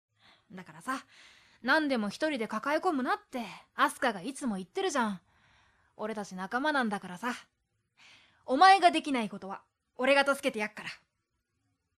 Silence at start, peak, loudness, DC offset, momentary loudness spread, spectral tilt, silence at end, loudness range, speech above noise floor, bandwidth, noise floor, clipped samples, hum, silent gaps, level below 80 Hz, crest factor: 0.5 s; -8 dBFS; -30 LUFS; under 0.1%; 18 LU; -3.5 dB/octave; 1 s; 7 LU; 51 dB; 14 kHz; -81 dBFS; under 0.1%; none; none; -74 dBFS; 24 dB